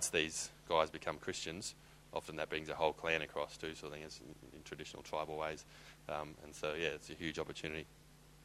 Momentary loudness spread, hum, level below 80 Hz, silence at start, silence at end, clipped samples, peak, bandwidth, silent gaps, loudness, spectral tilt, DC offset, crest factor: 15 LU; none; -64 dBFS; 0 s; 0 s; under 0.1%; -16 dBFS; 14 kHz; none; -41 LUFS; -2.5 dB/octave; under 0.1%; 26 dB